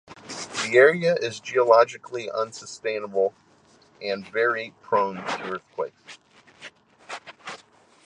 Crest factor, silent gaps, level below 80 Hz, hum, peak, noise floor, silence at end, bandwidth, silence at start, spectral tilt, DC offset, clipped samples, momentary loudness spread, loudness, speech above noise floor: 22 dB; none; -72 dBFS; none; -4 dBFS; -57 dBFS; 0.5 s; 10.5 kHz; 0.1 s; -4 dB/octave; under 0.1%; under 0.1%; 22 LU; -24 LUFS; 34 dB